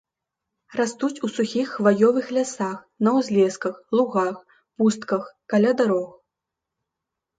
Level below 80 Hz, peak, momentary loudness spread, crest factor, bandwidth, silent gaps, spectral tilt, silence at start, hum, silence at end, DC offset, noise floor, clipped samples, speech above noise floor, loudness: -72 dBFS; -4 dBFS; 9 LU; 18 dB; 9.2 kHz; none; -5.5 dB/octave; 0.7 s; none; 1.3 s; under 0.1%; -85 dBFS; under 0.1%; 63 dB; -22 LUFS